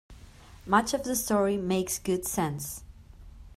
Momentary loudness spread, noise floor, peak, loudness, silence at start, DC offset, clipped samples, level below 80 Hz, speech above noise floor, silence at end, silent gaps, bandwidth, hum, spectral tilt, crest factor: 12 LU; -50 dBFS; -8 dBFS; -28 LUFS; 0.1 s; under 0.1%; under 0.1%; -50 dBFS; 22 dB; 0.1 s; none; 16 kHz; none; -4.5 dB/octave; 22 dB